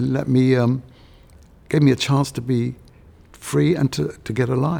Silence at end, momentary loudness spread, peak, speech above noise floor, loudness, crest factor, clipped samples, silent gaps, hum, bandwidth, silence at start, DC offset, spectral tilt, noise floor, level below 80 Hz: 0 s; 10 LU; -4 dBFS; 29 dB; -20 LUFS; 16 dB; under 0.1%; none; none; 16.5 kHz; 0 s; under 0.1%; -6.5 dB/octave; -48 dBFS; -48 dBFS